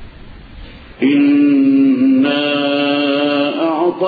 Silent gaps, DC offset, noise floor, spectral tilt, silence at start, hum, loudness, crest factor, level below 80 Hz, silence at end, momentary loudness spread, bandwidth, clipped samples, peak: none; under 0.1%; -35 dBFS; -8 dB/octave; 0 s; none; -13 LUFS; 10 dB; -44 dBFS; 0 s; 5 LU; 4.9 kHz; under 0.1%; -4 dBFS